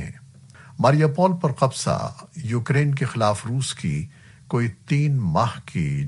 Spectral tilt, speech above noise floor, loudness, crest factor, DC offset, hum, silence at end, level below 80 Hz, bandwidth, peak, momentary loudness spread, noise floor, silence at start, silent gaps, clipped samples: -6.5 dB/octave; 25 dB; -22 LUFS; 18 dB; under 0.1%; none; 0 s; -50 dBFS; 11.5 kHz; -4 dBFS; 11 LU; -46 dBFS; 0 s; none; under 0.1%